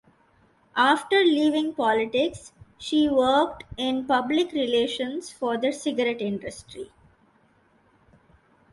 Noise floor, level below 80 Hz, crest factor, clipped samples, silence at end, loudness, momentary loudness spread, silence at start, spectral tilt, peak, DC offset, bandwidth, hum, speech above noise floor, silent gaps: -62 dBFS; -58 dBFS; 20 dB; under 0.1%; 1.9 s; -24 LUFS; 16 LU; 0.75 s; -4 dB/octave; -6 dBFS; under 0.1%; 11.5 kHz; none; 38 dB; none